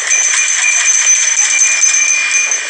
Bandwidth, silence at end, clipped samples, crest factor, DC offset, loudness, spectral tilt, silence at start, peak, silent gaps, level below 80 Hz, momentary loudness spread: 10.5 kHz; 0 s; under 0.1%; 10 dB; under 0.1%; -8 LUFS; 6 dB/octave; 0 s; 0 dBFS; none; -74 dBFS; 2 LU